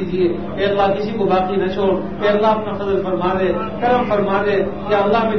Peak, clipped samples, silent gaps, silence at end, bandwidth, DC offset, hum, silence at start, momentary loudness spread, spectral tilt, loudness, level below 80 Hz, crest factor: -4 dBFS; under 0.1%; none; 0 s; 6.4 kHz; 2%; none; 0 s; 4 LU; -8 dB/octave; -18 LUFS; -42 dBFS; 14 dB